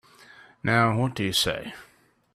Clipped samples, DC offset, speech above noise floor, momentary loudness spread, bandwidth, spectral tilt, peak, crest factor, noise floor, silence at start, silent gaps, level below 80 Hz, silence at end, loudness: under 0.1%; under 0.1%; 27 dB; 17 LU; 15.5 kHz; -4.5 dB/octave; -6 dBFS; 20 dB; -52 dBFS; 0.65 s; none; -56 dBFS; 0.5 s; -24 LUFS